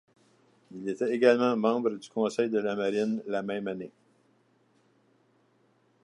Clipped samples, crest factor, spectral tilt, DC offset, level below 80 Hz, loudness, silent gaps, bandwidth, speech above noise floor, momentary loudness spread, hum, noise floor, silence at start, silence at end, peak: under 0.1%; 24 dB; -6 dB/octave; under 0.1%; -80 dBFS; -28 LUFS; none; 11.5 kHz; 40 dB; 15 LU; none; -67 dBFS; 0.7 s; 2.15 s; -8 dBFS